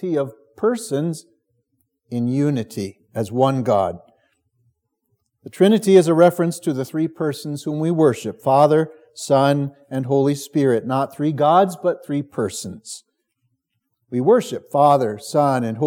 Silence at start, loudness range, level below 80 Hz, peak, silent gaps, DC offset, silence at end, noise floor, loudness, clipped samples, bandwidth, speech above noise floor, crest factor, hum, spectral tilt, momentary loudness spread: 0 s; 5 LU; -72 dBFS; 0 dBFS; none; under 0.1%; 0 s; -74 dBFS; -19 LUFS; under 0.1%; 18.5 kHz; 55 dB; 18 dB; none; -6.5 dB/octave; 14 LU